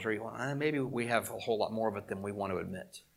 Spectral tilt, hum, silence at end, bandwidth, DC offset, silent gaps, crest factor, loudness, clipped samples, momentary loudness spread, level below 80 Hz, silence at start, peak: -5.5 dB/octave; none; 0.15 s; 16.5 kHz; under 0.1%; none; 22 dB; -35 LUFS; under 0.1%; 7 LU; -72 dBFS; 0 s; -14 dBFS